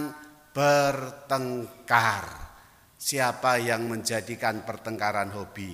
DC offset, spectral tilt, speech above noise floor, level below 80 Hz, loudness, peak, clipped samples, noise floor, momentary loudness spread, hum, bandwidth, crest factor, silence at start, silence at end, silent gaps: under 0.1%; -4 dB/octave; 27 dB; -58 dBFS; -27 LUFS; -4 dBFS; under 0.1%; -54 dBFS; 14 LU; none; 16 kHz; 24 dB; 0 s; 0 s; none